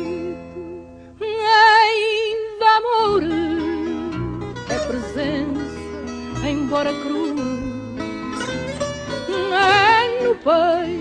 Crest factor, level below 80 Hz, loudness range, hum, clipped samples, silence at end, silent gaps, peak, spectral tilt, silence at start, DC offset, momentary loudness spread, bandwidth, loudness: 18 dB; -44 dBFS; 8 LU; none; under 0.1%; 0 s; none; -2 dBFS; -4.5 dB/octave; 0 s; under 0.1%; 16 LU; 10 kHz; -19 LUFS